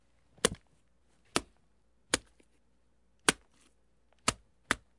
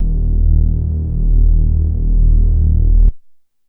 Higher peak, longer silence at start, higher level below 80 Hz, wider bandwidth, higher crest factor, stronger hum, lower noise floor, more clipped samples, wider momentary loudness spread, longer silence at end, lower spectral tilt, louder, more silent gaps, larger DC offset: second, -6 dBFS vs -2 dBFS; first, 0.45 s vs 0 s; second, -60 dBFS vs -12 dBFS; first, 11.5 kHz vs 0.8 kHz; first, 34 dB vs 10 dB; neither; first, -73 dBFS vs -43 dBFS; neither; first, 12 LU vs 4 LU; second, 0.2 s vs 0.5 s; second, -1.5 dB/octave vs -14.5 dB/octave; second, -33 LUFS vs -16 LUFS; neither; neither